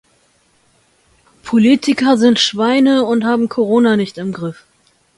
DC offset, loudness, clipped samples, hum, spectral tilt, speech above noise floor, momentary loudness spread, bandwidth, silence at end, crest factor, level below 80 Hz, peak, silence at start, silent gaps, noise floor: under 0.1%; -13 LUFS; under 0.1%; none; -5 dB/octave; 43 dB; 11 LU; 11.5 kHz; 0.65 s; 16 dB; -58 dBFS; 0 dBFS; 1.45 s; none; -57 dBFS